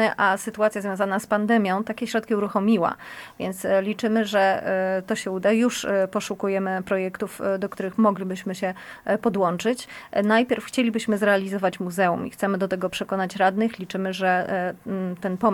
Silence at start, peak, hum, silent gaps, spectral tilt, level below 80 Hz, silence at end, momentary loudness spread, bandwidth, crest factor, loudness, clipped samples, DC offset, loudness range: 0 s; -6 dBFS; none; none; -5.5 dB/octave; -64 dBFS; 0 s; 8 LU; 18 kHz; 16 dB; -24 LUFS; under 0.1%; under 0.1%; 2 LU